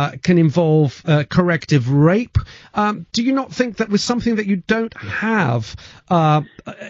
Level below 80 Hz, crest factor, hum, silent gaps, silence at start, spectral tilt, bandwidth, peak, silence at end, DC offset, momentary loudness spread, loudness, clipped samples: -40 dBFS; 16 dB; none; none; 0 s; -6 dB/octave; 7.8 kHz; -2 dBFS; 0 s; under 0.1%; 9 LU; -18 LUFS; under 0.1%